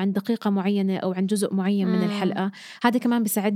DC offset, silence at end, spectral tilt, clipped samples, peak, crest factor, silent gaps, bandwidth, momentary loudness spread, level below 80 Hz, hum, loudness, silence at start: under 0.1%; 0 s; -6 dB/octave; under 0.1%; -4 dBFS; 18 dB; none; 16 kHz; 3 LU; -80 dBFS; none; -24 LUFS; 0 s